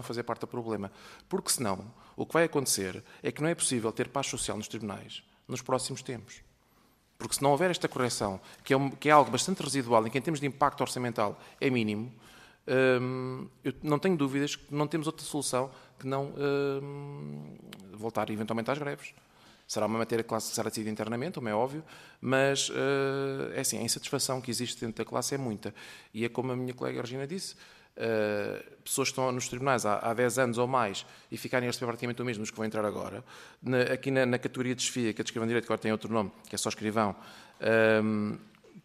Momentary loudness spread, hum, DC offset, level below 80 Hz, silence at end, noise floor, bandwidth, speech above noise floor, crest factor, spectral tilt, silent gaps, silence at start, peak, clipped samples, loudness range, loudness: 14 LU; none; under 0.1%; -66 dBFS; 0.05 s; -65 dBFS; 14.5 kHz; 34 dB; 24 dB; -4 dB/octave; none; 0 s; -6 dBFS; under 0.1%; 7 LU; -31 LUFS